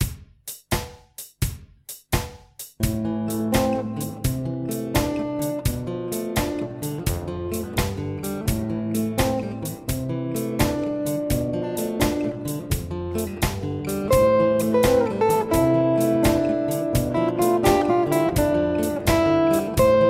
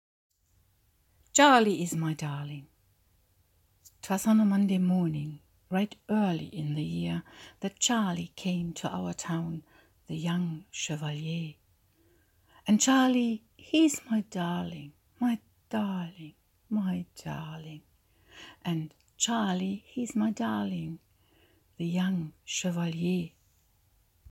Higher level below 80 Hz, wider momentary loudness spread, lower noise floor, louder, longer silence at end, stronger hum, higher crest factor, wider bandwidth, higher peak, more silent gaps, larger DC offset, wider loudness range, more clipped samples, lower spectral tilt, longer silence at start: first, -36 dBFS vs -66 dBFS; second, 10 LU vs 18 LU; second, -43 dBFS vs -68 dBFS; first, -23 LUFS vs -30 LUFS; second, 0 s vs 1.05 s; neither; second, 18 dB vs 24 dB; about the same, 16.5 kHz vs 16.5 kHz; about the same, -6 dBFS vs -8 dBFS; neither; neither; about the same, 7 LU vs 7 LU; neither; first, -6 dB/octave vs -4.5 dB/octave; second, 0 s vs 1.35 s